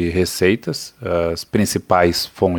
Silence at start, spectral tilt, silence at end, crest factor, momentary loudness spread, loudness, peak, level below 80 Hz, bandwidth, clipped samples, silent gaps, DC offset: 0 s; -5 dB/octave; 0 s; 18 dB; 7 LU; -19 LUFS; 0 dBFS; -42 dBFS; 19.5 kHz; under 0.1%; none; under 0.1%